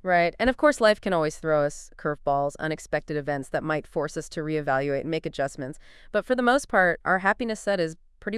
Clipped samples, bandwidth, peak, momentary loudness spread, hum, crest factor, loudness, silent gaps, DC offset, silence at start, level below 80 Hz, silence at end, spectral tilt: under 0.1%; 12 kHz; -8 dBFS; 10 LU; none; 18 dB; -25 LUFS; none; under 0.1%; 0.05 s; -48 dBFS; 0 s; -5 dB/octave